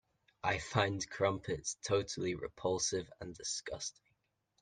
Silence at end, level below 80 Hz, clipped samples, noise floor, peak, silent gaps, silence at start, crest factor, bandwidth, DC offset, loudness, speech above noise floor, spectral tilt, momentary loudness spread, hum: 0.7 s; -64 dBFS; under 0.1%; -81 dBFS; -14 dBFS; none; 0.45 s; 24 dB; 10.5 kHz; under 0.1%; -37 LUFS; 43 dB; -3.5 dB/octave; 9 LU; none